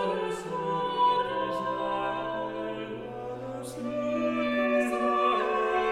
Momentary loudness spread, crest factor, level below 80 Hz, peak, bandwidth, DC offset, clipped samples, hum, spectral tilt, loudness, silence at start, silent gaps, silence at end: 12 LU; 14 dB; -60 dBFS; -14 dBFS; 15 kHz; under 0.1%; under 0.1%; none; -5 dB/octave; -29 LUFS; 0 s; none; 0 s